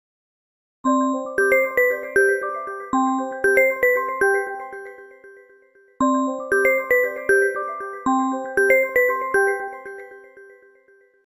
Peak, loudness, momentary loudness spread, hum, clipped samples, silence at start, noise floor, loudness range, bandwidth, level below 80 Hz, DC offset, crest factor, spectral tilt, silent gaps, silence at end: -4 dBFS; -20 LUFS; 13 LU; none; under 0.1%; 0.85 s; -56 dBFS; 3 LU; 15.5 kHz; -60 dBFS; under 0.1%; 18 dB; -4 dB/octave; none; 0.8 s